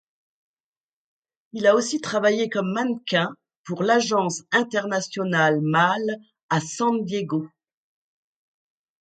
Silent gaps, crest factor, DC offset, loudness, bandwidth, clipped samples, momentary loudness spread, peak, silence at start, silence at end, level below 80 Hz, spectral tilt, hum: 3.57-3.64 s, 6.43-6.49 s; 20 dB; under 0.1%; -23 LUFS; 9.4 kHz; under 0.1%; 10 LU; -4 dBFS; 1.55 s; 1.55 s; -72 dBFS; -4.5 dB/octave; none